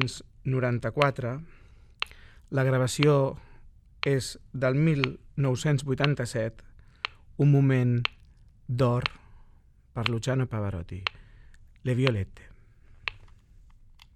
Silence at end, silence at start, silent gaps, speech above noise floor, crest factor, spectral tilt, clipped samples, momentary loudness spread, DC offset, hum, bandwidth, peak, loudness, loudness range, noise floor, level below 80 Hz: 1 s; 0 s; none; 30 dB; 26 dB; -6.5 dB/octave; under 0.1%; 14 LU; under 0.1%; none; 12.5 kHz; -2 dBFS; -28 LUFS; 5 LU; -56 dBFS; -52 dBFS